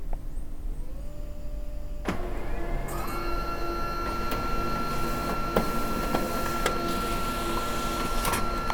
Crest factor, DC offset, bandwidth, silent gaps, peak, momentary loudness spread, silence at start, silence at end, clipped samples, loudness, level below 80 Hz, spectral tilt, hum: 20 dB; under 0.1%; 19 kHz; none; -8 dBFS; 13 LU; 0 s; 0 s; under 0.1%; -31 LUFS; -32 dBFS; -4.5 dB/octave; none